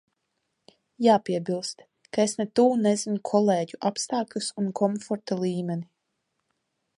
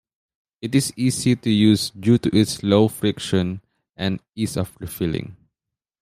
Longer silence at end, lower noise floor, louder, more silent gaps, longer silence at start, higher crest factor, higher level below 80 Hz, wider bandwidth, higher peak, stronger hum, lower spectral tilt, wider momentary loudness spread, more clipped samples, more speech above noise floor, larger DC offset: first, 1.15 s vs 0.7 s; second, -78 dBFS vs -86 dBFS; second, -26 LUFS vs -21 LUFS; second, none vs 4.29-4.33 s; first, 1 s vs 0.65 s; about the same, 20 dB vs 18 dB; second, -74 dBFS vs -52 dBFS; second, 11.5 kHz vs 15.5 kHz; second, -6 dBFS vs -2 dBFS; neither; about the same, -5 dB/octave vs -5.5 dB/octave; about the same, 10 LU vs 11 LU; neither; second, 53 dB vs 66 dB; neither